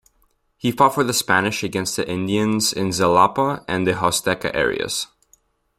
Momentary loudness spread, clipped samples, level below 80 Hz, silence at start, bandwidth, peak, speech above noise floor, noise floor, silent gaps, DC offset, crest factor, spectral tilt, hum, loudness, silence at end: 8 LU; under 0.1%; -52 dBFS; 0.65 s; 16 kHz; -2 dBFS; 44 dB; -64 dBFS; none; under 0.1%; 20 dB; -3.5 dB/octave; none; -20 LUFS; 0.75 s